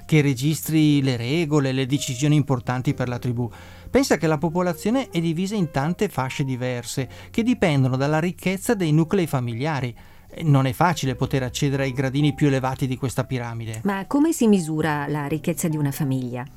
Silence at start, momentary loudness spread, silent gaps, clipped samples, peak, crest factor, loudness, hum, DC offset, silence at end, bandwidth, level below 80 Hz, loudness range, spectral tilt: 0 s; 8 LU; none; under 0.1%; -6 dBFS; 16 dB; -22 LUFS; none; under 0.1%; 0 s; 16.5 kHz; -48 dBFS; 1 LU; -6 dB/octave